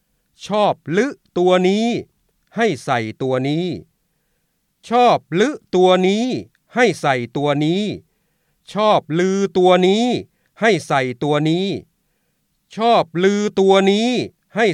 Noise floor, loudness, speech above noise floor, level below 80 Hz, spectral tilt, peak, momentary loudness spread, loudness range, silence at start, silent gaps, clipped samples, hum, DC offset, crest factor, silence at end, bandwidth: -68 dBFS; -17 LUFS; 52 dB; -62 dBFS; -5.5 dB/octave; -2 dBFS; 12 LU; 3 LU; 0.4 s; none; under 0.1%; none; under 0.1%; 16 dB; 0 s; 11.5 kHz